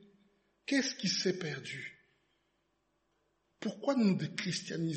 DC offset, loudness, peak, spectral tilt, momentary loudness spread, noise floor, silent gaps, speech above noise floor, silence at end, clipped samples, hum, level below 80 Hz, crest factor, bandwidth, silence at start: under 0.1%; -34 LUFS; -18 dBFS; -4.5 dB/octave; 13 LU; -78 dBFS; none; 44 dB; 0 s; under 0.1%; 50 Hz at -70 dBFS; -80 dBFS; 20 dB; 8.4 kHz; 0.7 s